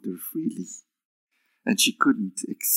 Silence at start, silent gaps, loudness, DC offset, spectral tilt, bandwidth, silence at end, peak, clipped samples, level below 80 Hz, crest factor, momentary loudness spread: 0.05 s; 1.05-1.27 s; -25 LUFS; under 0.1%; -2.5 dB/octave; 16.5 kHz; 0 s; -4 dBFS; under 0.1%; -90 dBFS; 24 dB; 18 LU